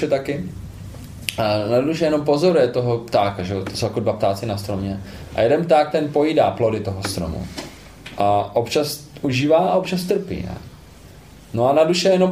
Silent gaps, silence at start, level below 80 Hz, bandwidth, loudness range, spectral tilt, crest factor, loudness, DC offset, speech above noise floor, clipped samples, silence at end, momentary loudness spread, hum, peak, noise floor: none; 0 s; -44 dBFS; 15.5 kHz; 2 LU; -6 dB/octave; 20 dB; -20 LUFS; under 0.1%; 24 dB; under 0.1%; 0 s; 16 LU; none; 0 dBFS; -43 dBFS